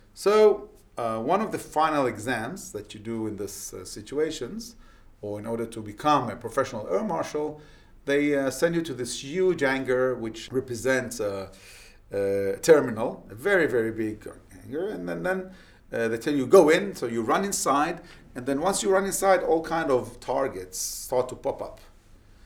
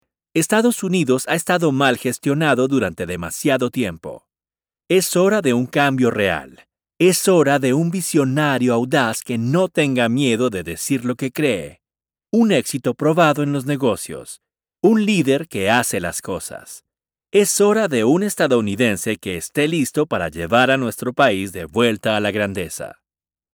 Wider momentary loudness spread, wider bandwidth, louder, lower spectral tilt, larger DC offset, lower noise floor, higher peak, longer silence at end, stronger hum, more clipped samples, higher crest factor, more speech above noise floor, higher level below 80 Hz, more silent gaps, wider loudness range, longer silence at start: first, 16 LU vs 10 LU; about the same, 18.5 kHz vs over 20 kHz; second, -26 LUFS vs -18 LUFS; about the same, -4.5 dB/octave vs -4.5 dB/octave; neither; second, -53 dBFS vs under -90 dBFS; second, -4 dBFS vs 0 dBFS; about the same, 0.6 s vs 0.65 s; neither; neither; about the same, 22 dB vs 18 dB; second, 27 dB vs over 72 dB; about the same, -54 dBFS vs -54 dBFS; neither; first, 6 LU vs 3 LU; second, 0.15 s vs 0.35 s